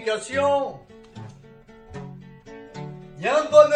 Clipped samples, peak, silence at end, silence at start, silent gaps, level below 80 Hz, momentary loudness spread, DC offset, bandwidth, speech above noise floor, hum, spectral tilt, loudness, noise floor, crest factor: under 0.1%; 0 dBFS; 0 s; 0 s; none; -56 dBFS; 24 LU; under 0.1%; 10 kHz; 29 dB; none; -4.5 dB/octave; -21 LUFS; -48 dBFS; 22 dB